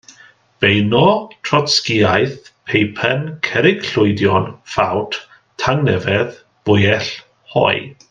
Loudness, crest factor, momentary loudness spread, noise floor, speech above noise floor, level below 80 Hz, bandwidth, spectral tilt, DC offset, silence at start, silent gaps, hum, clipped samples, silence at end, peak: -16 LUFS; 16 dB; 9 LU; -47 dBFS; 32 dB; -52 dBFS; 9.6 kHz; -5.5 dB/octave; under 0.1%; 0.6 s; none; none; under 0.1%; 0.2 s; 0 dBFS